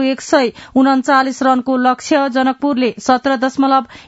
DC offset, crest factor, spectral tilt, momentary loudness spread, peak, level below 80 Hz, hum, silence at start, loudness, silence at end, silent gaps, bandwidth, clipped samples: under 0.1%; 14 dB; -3.5 dB/octave; 3 LU; 0 dBFS; -56 dBFS; none; 0 s; -14 LUFS; 0.05 s; none; 8 kHz; under 0.1%